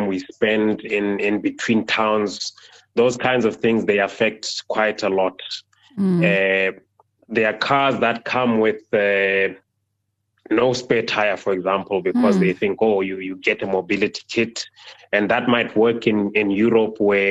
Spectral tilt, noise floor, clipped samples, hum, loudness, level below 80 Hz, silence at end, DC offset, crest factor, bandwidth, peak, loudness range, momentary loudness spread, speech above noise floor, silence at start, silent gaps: -5.5 dB/octave; -74 dBFS; under 0.1%; none; -20 LUFS; -60 dBFS; 0 s; under 0.1%; 18 dB; 9.8 kHz; -2 dBFS; 2 LU; 7 LU; 54 dB; 0 s; none